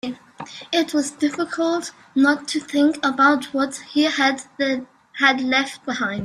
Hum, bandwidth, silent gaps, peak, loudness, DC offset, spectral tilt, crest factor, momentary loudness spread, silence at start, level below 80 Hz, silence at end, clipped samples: none; 13 kHz; none; -2 dBFS; -20 LUFS; under 0.1%; -3 dB/octave; 18 dB; 10 LU; 0.05 s; -64 dBFS; 0 s; under 0.1%